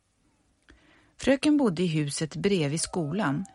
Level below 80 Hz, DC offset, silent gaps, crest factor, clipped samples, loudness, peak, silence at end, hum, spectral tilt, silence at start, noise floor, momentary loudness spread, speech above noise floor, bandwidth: -56 dBFS; under 0.1%; none; 18 dB; under 0.1%; -26 LUFS; -10 dBFS; 0.1 s; none; -5 dB/octave; 1.2 s; -69 dBFS; 6 LU; 43 dB; 11.5 kHz